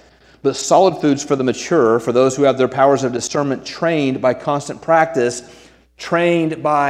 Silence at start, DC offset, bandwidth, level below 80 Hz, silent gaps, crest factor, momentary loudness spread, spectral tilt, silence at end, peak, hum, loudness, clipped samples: 0.45 s; under 0.1%; 13.5 kHz; -56 dBFS; none; 16 dB; 8 LU; -5 dB/octave; 0 s; 0 dBFS; none; -16 LUFS; under 0.1%